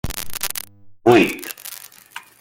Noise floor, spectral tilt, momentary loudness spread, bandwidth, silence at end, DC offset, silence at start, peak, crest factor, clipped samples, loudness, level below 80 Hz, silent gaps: -41 dBFS; -4.5 dB/octave; 24 LU; 17 kHz; 0.2 s; under 0.1%; 0.05 s; 0 dBFS; 22 dB; under 0.1%; -19 LUFS; -42 dBFS; none